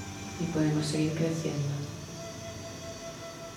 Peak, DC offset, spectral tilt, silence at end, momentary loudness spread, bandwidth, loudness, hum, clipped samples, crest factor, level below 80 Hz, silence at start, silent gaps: -16 dBFS; under 0.1%; -5.5 dB/octave; 0 s; 12 LU; 16.5 kHz; -33 LUFS; none; under 0.1%; 16 dB; -58 dBFS; 0 s; none